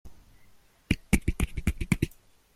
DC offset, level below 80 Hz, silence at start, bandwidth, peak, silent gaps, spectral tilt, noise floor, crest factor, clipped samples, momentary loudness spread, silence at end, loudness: under 0.1%; -36 dBFS; 0.05 s; 16 kHz; -8 dBFS; none; -5.5 dB/octave; -58 dBFS; 24 dB; under 0.1%; 5 LU; 0.45 s; -30 LUFS